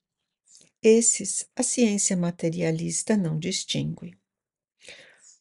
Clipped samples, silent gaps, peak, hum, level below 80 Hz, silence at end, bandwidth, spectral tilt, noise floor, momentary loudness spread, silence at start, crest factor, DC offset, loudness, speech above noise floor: under 0.1%; none; -8 dBFS; none; -64 dBFS; 0.4 s; 11.5 kHz; -4 dB/octave; under -90 dBFS; 10 LU; 0.85 s; 18 dB; under 0.1%; -24 LUFS; over 66 dB